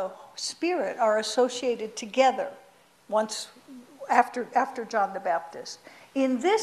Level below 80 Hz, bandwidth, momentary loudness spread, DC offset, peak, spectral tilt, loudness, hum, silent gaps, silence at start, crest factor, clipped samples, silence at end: -76 dBFS; 13.5 kHz; 14 LU; under 0.1%; -6 dBFS; -2.5 dB/octave; -27 LUFS; none; none; 0 s; 20 dB; under 0.1%; 0 s